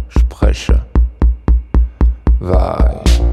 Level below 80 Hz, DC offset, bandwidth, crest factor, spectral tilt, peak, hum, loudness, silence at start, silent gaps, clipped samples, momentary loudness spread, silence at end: -12 dBFS; under 0.1%; 9.6 kHz; 12 dB; -7 dB/octave; 0 dBFS; none; -15 LUFS; 0 s; none; under 0.1%; 3 LU; 0 s